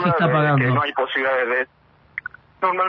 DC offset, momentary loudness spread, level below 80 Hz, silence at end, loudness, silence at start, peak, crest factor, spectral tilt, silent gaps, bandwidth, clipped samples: under 0.1%; 15 LU; -60 dBFS; 0 s; -19 LUFS; 0 s; -6 dBFS; 14 dB; -9 dB/octave; none; 5.6 kHz; under 0.1%